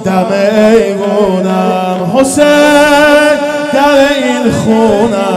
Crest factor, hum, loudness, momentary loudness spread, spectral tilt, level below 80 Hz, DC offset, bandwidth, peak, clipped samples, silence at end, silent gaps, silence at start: 8 dB; none; -8 LUFS; 6 LU; -5 dB/octave; -40 dBFS; under 0.1%; 15 kHz; 0 dBFS; 2%; 0 s; none; 0 s